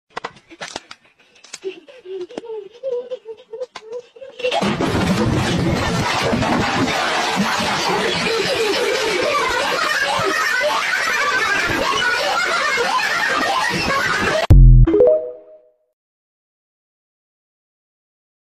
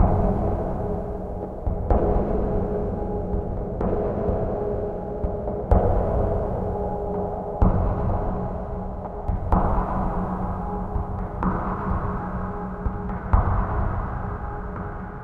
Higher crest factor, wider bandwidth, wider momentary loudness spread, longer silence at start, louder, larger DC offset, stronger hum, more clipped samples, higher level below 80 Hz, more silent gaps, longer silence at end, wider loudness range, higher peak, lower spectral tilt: about the same, 18 dB vs 18 dB; first, 13.5 kHz vs 3.4 kHz; first, 17 LU vs 9 LU; first, 0.15 s vs 0 s; first, -17 LUFS vs -26 LUFS; neither; neither; neither; about the same, -24 dBFS vs -28 dBFS; neither; first, 2.95 s vs 0 s; first, 14 LU vs 3 LU; first, 0 dBFS vs -4 dBFS; second, -4.5 dB/octave vs -11 dB/octave